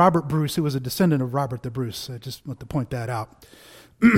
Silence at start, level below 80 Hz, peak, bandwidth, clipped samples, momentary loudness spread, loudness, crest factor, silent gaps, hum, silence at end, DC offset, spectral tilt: 0 s; -52 dBFS; -4 dBFS; 16.5 kHz; under 0.1%; 14 LU; -25 LUFS; 18 dB; none; none; 0 s; under 0.1%; -6.5 dB/octave